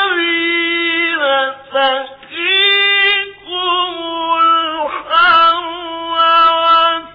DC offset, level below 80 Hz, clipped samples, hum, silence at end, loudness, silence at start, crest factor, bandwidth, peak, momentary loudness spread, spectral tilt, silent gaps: under 0.1%; -54 dBFS; under 0.1%; none; 0 s; -12 LUFS; 0 s; 12 dB; 5.2 kHz; -2 dBFS; 11 LU; -3.5 dB/octave; none